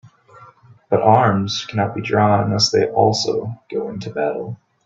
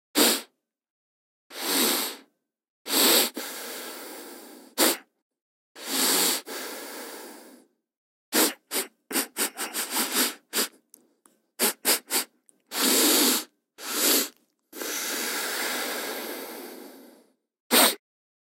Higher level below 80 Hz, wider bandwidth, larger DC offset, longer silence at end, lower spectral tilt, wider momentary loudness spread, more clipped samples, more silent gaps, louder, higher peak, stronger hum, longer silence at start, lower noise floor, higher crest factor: first, -56 dBFS vs under -90 dBFS; second, 7.8 kHz vs 16 kHz; neither; second, 0.3 s vs 0.6 s; first, -5 dB/octave vs 0.5 dB/octave; second, 12 LU vs 21 LU; neither; second, none vs 0.90-1.50 s, 2.70-2.85 s, 5.22-5.30 s, 5.42-5.75 s, 7.97-8.32 s, 17.60-17.70 s; first, -18 LUFS vs -24 LUFS; first, 0 dBFS vs -4 dBFS; neither; about the same, 0.05 s vs 0.15 s; second, -46 dBFS vs -65 dBFS; second, 18 dB vs 24 dB